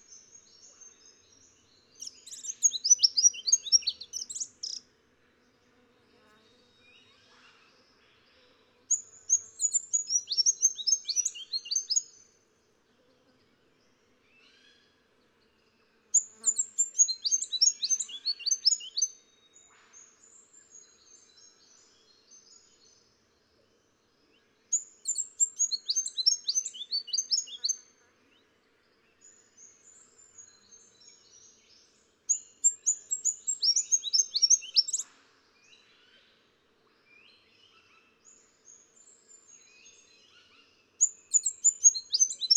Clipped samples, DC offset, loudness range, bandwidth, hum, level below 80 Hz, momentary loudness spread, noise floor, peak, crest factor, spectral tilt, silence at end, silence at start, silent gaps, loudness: under 0.1%; under 0.1%; 13 LU; 16 kHz; none; -84 dBFS; 13 LU; -69 dBFS; -8 dBFS; 24 dB; 5 dB/octave; 0 s; 0.1 s; none; -26 LUFS